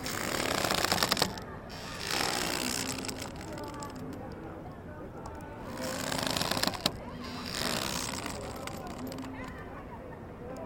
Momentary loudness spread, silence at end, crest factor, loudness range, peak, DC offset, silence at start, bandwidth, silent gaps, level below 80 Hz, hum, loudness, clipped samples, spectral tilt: 15 LU; 0 s; 30 dB; 7 LU; -6 dBFS; under 0.1%; 0 s; 17 kHz; none; -52 dBFS; none; -33 LUFS; under 0.1%; -3 dB/octave